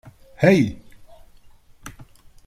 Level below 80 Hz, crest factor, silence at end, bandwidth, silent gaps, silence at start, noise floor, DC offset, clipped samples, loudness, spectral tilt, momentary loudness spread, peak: -50 dBFS; 20 dB; 0.45 s; 15 kHz; none; 0.4 s; -49 dBFS; under 0.1%; under 0.1%; -18 LUFS; -7 dB/octave; 26 LU; -2 dBFS